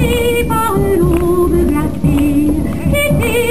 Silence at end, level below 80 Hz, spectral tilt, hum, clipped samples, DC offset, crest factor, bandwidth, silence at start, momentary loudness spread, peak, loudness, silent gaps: 0 s; -24 dBFS; -6 dB/octave; none; under 0.1%; 5%; 10 dB; 15.5 kHz; 0 s; 3 LU; -2 dBFS; -13 LUFS; none